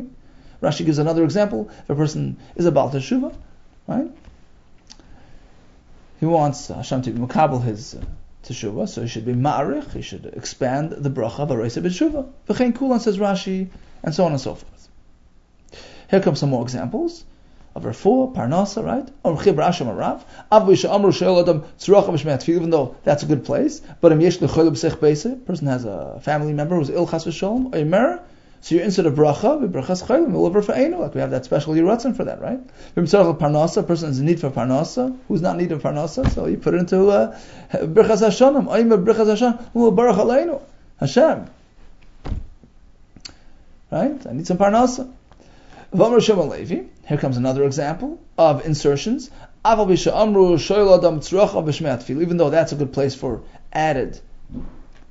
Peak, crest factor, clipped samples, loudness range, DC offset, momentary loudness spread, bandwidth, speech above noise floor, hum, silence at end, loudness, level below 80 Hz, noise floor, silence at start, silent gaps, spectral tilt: 0 dBFS; 20 dB; under 0.1%; 8 LU; under 0.1%; 13 LU; 8 kHz; 32 dB; none; 0.2 s; -19 LUFS; -42 dBFS; -50 dBFS; 0 s; none; -6.5 dB/octave